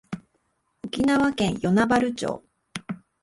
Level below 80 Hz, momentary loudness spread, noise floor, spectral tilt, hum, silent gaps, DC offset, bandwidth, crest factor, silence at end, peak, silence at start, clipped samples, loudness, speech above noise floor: -54 dBFS; 18 LU; -71 dBFS; -5.5 dB/octave; none; none; under 0.1%; 11.5 kHz; 16 dB; 0.25 s; -8 dBFS; 0.1 s; under 0.1%; -23 LUFS; 49 dB